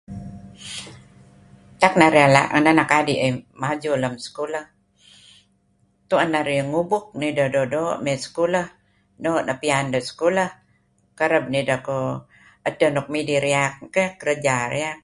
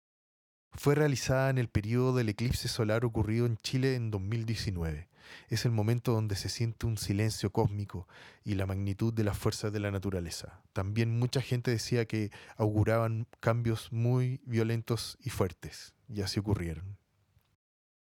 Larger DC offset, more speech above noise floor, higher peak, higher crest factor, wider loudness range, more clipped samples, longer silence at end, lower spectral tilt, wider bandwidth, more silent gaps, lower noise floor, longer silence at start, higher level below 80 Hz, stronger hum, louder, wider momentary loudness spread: neither; first, 43 dB vs 39 dB; first, 0 dBFS vs -12 dBFS; about the same, 22 dB vs 20 dB; first, 7 LU vs 4 LU; neither; second, 0.05 s vs 1.2 s; about the same, -5 dB/octave vs -6 dB/octave; second, 11.5 kHz vs 17 kHz; neither; second, -63 dBFS vs -71 dBFS; second, 0.1 s vs 0.75 s; about the same, -58 dBFS vs -54 dBFS; neither; first, -21 LUFS vs -32 LUFS; first, 14 LU vs 11 LU